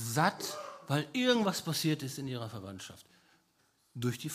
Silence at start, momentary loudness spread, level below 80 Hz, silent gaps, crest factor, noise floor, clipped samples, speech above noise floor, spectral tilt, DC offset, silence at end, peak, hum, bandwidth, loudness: 0 s; 16 LU; -76 dBFS; none; 22 dB; -72 dBFS; under 0.1%; 39 dB; -4.5 dB/octave; under 0.1%; 0 s; -14 dBFS; none; 15.5 kHz; -33 LUFS